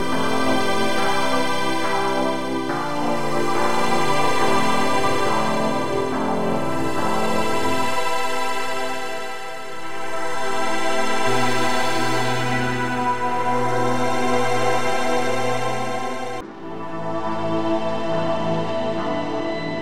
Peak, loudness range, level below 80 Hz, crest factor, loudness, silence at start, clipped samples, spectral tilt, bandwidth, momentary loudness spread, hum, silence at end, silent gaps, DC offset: -6 dBFS; 4 LU; -52 dBFS; 16 dB; -22 LUFS; 0 s; under 0.1%; -4.5 dB/octave; 16 kHz; 7 LU; none; 0 s; none; 8%